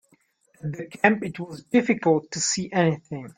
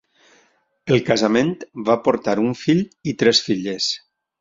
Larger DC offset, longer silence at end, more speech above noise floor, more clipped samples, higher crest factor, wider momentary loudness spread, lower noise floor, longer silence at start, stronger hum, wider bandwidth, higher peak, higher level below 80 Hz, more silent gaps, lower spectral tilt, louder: neither; second, 0.1 s vs 0.45 s; about the same, 40 dB vs 42 dB; neither; about the same, 24 dB vs 20 dB; first, 13 LU vs 9 LU; about the same, -64 dBFS vs -61 dBFS; second, 0.65 s vs 0.85 s; neither; first, 10 kHz vs 7.8 kHz; about the same, -2 dBFS vs -2 dBFS; second, -64 dBFS vs -58 dBFS; neither; about the same, -4.5 dB/octave vs -5 dB/octave; second, -24 LUFS vs -19 LUFS